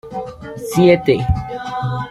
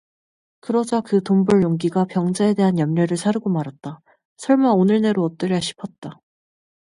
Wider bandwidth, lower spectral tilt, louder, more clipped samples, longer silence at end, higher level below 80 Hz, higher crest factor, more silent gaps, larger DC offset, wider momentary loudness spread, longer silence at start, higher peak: first, 13.5 kHz vs 11.5 kHz; about the same, -7 dB/octave vs -7 dB/octave; first, -16 LUFS vs -19 LUFS; neither; second, 0 s vs 0.8 s; first, -34 dBFS vs -60 dBFS; about the same, 16 dB vs 16 dB; second, none vs 4.25-4.36 s, 5.98-6.02 s; neither; about the same, 17 LU vs 18 LU; second, 0.05 s vs 0.7 s; about the same, -2 dBFS vs -4 dBFS